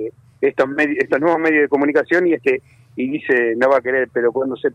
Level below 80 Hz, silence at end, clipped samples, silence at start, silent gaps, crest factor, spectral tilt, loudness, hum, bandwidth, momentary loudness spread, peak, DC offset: -64 dBFS; 0 s; under 0.1%; 0 s; none; 14 dB; -7 dB/octave; -17 LUFS; none; 9.2 kHz; 8 LU; -4 dBFS; under 0.1%